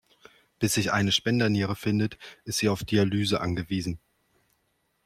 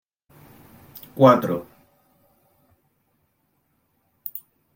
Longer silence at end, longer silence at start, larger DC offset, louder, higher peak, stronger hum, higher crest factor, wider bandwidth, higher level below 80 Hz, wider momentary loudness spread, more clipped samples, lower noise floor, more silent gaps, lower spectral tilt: first, 1.1 s vs 0.35 s; second, 0.6 s vs 1.15 s; neither; second, -26 LUFS vs -20 LUFS; second, -10 dBFS vs -2 dBFS; neither; second, 18 dB vs 24 dB; about the same, 15.5 kHz vs 16.5 kHz; first, -56 dBFS vs -66 dBFS; second, 8 LU vs 26 LU; neither; first, -73 dBFS vs -69 dBFS; neither; second, -4.5 dB/octave vs -7.5 dB/octave